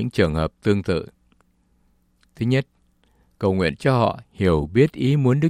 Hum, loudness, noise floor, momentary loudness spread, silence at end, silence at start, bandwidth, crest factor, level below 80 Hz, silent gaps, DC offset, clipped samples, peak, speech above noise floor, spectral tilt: none; -21 LUFS; -62 dBFS; 8 LU; 0 s; 0 s; 12 kHz; 18 dB; -44 dBFS; none; under 0.1%; under 0.1%; -4 dBFS; 42 dB; -8 dB/octave